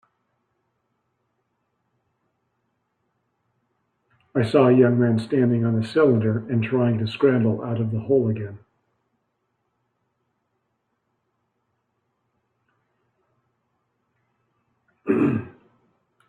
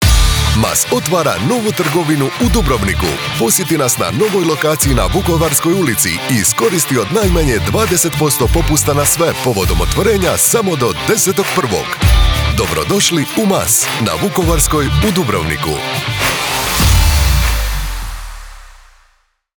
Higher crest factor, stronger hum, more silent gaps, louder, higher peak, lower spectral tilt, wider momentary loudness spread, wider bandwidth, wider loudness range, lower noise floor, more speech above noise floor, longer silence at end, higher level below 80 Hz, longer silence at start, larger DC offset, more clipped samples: first, 20 dB vs 14 dB; neither; neither; second, -21 LUFS vs -13 LUFS; second, -4 dBFS vs 0 dBFS; first, -9 dB/octave vs -4 dB/octave; first, 9 LU vs 5 LU; second, 9.4 kHz vs over 20 kHz; first, 10 LU vs 2 LU; first, -75 dBFS vs -56 dBFS; first, 55 dB vs 43 dB; about the same, 0.8 s vs 0.9 s; second, -66 dBFS vs -20 dBFS; first, 4.35 s vs 0 s; neither; neither